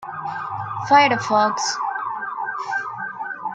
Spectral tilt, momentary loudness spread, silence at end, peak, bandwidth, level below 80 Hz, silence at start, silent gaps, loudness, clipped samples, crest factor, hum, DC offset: -3 dB/octave; 14 LU; 0 s; -2 dBFS; 9.2 kHz; -68 dBFS; 0 s; none; -21 LUFS; under 0.1%; 20 dB; none; under 0.1%